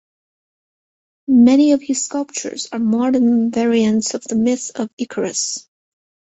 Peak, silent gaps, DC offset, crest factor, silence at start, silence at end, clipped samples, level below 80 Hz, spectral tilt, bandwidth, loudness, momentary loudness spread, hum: -2 dBFS; 4.93-4.97 s; under 0.1%; 16 dB; 1.3 s; 0.7 s; under 0.1%; -60 dBFS; -4 dB/octave; 8.2 kHz; -17 LUFS; 13 LU; none